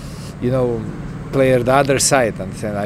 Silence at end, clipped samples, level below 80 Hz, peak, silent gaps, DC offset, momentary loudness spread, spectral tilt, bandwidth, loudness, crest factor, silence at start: 0 s; under 0.1%; -38 dBFS; 0 dBFS; none; under 0.1%; 14 LU; -4.5 dB/octave; 16 kHz; -17 LUFS; 18 dB; 0 s